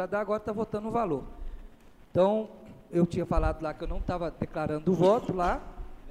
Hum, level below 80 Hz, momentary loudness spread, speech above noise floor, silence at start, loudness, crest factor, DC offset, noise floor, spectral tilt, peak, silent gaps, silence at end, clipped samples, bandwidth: none; -40 dBFS; 16 LU; 23 dB; 0 s; -29 LUFS; 18 dB; under 0.1%; -51 dBFS; -8 dB/octave; -10 dBFS; none; 0 s; under 0.1%; 12.5 kHz